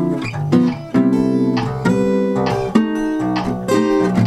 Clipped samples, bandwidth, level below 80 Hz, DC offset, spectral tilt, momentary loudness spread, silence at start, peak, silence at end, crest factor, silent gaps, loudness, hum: under 0.1%; 12.5 kHz; -44 dBFS; under 0.1%; -7.5 dB/octave; 4 LU; 0 s; 0 dBFS; 0 s; 16 dB; none; -17 LUFS; none